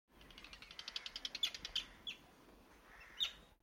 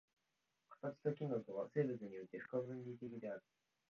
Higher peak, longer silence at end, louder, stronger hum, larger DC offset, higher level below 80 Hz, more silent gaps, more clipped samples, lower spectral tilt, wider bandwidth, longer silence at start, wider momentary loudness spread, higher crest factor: about the same, -24 dBFS vs -26 dBFS; second, 0.1 s vs 0.5 s; first, -43 LUFS vs -46 LUFS; neither; neither; first, -68 dBFS vs -88 dBFS; neither; neither; second, 0 dB/octave vs -8.5 dB/octave; first, 16.5 kHz vs 6.8 kHz; second, 0.1 s vs 0.7 s; first, 23 LU vs 10 LU; about the same, 24 dB vs 22 dB